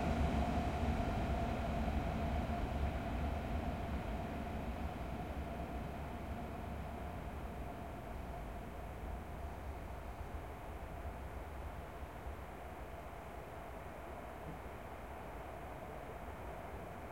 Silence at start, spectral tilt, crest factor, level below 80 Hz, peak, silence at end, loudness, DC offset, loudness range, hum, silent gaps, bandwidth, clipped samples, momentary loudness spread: 0 s; -7 dB/octave; 18 dB; -46 dBFS; -24 dBFS; 0 s; -44 LUFS; under 0.1%; 10 LU; none; none; 16.5 kHz; under 0.1%; 11 LU